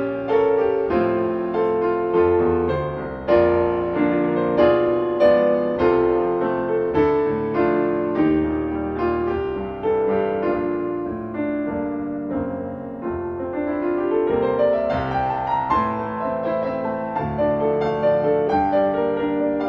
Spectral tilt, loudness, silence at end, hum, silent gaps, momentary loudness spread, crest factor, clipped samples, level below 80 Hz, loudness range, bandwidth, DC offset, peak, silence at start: -9.5 dB/octave; -21 LUFS; 0 s; none; none; 8 LU; 16 dB; under 0.1%; -44 dBFS; 5 LU; 5.8 kHz; under 0.1%; -4 dBFS; 0 s